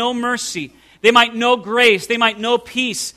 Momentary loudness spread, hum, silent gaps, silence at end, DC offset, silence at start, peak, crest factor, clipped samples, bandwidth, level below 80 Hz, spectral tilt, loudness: 10 LU; none; none; 0.05 s; under 0.1%; 0 s; 0 dBFS; 16 dB; under 0.1%; 14.5 kHz; -58 dBFS; -2 dB/octave; -15 LUFS